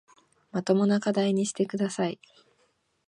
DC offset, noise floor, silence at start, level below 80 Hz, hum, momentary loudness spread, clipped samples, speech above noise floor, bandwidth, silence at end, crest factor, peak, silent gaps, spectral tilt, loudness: under 0.1%; -70 dBFS; 0.55 s; -74 dBFS; none; 10 LU; under 0.1%; 44 dB; 11 kHz; 0.95 s; 18 dB; -10 dBFS; none; -5.5 dB/octave; -27 LUFS